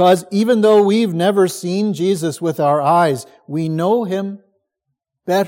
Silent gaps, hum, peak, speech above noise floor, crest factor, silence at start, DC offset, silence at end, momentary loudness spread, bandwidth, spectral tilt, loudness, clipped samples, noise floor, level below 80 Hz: none; none; -2 dBFS; 61 dB; 14 dB; 0 s; under 0.1%; 0 s; 11 LU; 17 kHz; -6 dB/octave; -16 LUFS; under 0.1%; -76 dBFS; -68 dBFS